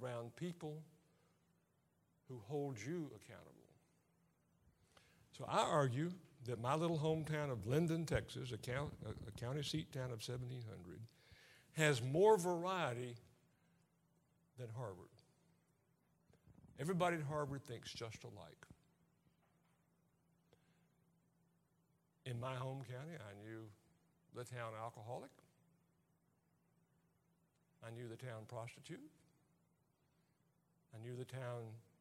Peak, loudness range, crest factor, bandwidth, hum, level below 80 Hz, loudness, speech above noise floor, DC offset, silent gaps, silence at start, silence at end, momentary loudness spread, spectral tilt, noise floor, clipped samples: -18 dBFS; 17 LU; 26 dB; 16 kHz; none; -72 dBFS; -43 LUFS; 37 dB; under 0.1%; none; 0 s; 0.2 s; 20 LU; -5.5 dB/octave; -80 dBFS; under 0.1%